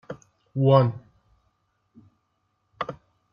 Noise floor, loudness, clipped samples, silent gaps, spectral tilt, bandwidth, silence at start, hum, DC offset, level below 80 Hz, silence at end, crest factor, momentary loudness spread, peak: -73 dBFS; -23 LUFS; under 0.1%; none; -9.5 dB/octave; 6.8 kHz; 0.1 s; none; under 0.1%; -66 dBFS; 0.4 s; 22 dB; 24 LU; -4 dBFS